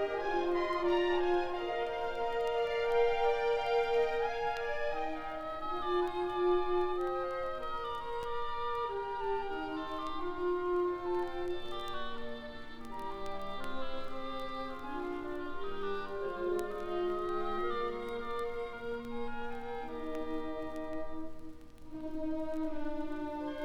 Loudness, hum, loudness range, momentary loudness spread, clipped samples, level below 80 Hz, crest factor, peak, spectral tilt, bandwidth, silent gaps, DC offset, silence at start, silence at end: -36 LUFS; none; 9 LU; 11 LU; under 0.1%; -50 dBFS; 16 dB; -20 dBFS; -5.5 dB/octave; 10.5 kHz; none; under 0.1%; 0 s; 0 s